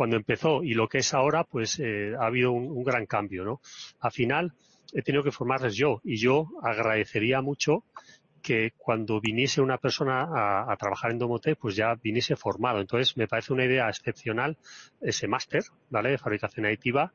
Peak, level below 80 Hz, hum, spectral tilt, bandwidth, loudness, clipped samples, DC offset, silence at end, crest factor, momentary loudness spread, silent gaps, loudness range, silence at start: -12 dBFS; -64 dBFS; none; -5 dB/octave; 7.4 kHz; -27 LUFS; under 0.1%; under 0.1%; 0.05 s; 16 dB; 6 LU; none; 2 LU; 0 s